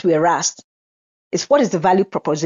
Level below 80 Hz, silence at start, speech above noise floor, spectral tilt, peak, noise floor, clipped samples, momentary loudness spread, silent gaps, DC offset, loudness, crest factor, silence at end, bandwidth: -64 dBFS; 0.05 s; over 73 dB; -4.5 dB/octave; -2 dBFS; under -90 dBFS; under 0.1%; 8 LU; 0.64-1.31 s; under 0.1%; -17 LUFS; 16 dB; 0 s; 7.6 kHz